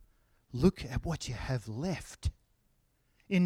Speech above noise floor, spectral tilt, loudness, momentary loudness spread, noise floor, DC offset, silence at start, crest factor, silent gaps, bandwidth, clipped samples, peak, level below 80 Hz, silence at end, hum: 39 dB; -6.5 dB/octave; -35 LUFS; 10 LU; -72 dBFS; under 0.1%; 0.55 s; 22 dB; none; 14.5 kHz; under 0.1%; -12 dBFS; -46 dBFS; 0 s; none